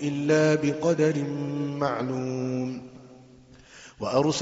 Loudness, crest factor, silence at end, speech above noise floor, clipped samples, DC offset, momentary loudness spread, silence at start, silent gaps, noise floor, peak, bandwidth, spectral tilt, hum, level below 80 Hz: -26 LUFS; 18 dB; 0 s; 27 dB; under 0.1%; under 0.1%; 12 LU; 0 s; none; -52 dBFS; -8 dBFS; 8 kHz; -6 dB/octave; none; -62 dBFS